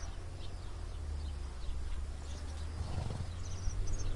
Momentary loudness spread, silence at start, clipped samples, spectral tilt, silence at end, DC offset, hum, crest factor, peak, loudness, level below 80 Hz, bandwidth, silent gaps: 6 LU; 0 s; under 0.1%; -5 dB/octave; 0 s; under 0.1%; none; 16 dB; -22 dBFS; -43 LUFS; -40 dBFS; 11.5 kHz; none